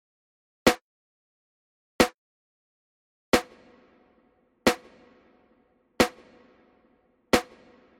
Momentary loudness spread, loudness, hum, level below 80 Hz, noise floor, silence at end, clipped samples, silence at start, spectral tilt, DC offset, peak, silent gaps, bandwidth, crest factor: 11 LU; -26 LUFS; none; -54 dBFS; -66 dBFS; 0.6 s; under 0.1%; 0.65 s; -3.5 dB/octave; under 0.1%; -4 dBFS; 0.81-1.99 s, 2.14-3.32 s; 16 kHz; 28 dB